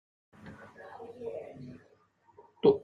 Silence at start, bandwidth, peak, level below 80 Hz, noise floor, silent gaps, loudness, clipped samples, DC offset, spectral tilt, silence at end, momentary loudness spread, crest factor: 0.45 s; 4.8 kHz; -10 dBFS; -70 dBFS; -66 dBFS; none; -34 LUFS; under 0.1%; under 0.1%; -8.5 dB/octave; 0.05 s; 25 LU; 24 dB